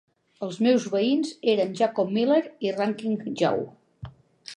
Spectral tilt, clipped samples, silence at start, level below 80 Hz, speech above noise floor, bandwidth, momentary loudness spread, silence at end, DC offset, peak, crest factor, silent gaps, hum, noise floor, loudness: -5.5 dB/octave; under 0.1%; 0.4 s; -64 dBFS; 21 dB; 11 kHz; 22 LU; 0 s; under 0.1%; -10 dBFS; 16 dB; none; none; -45 dBFS; -25 LUFS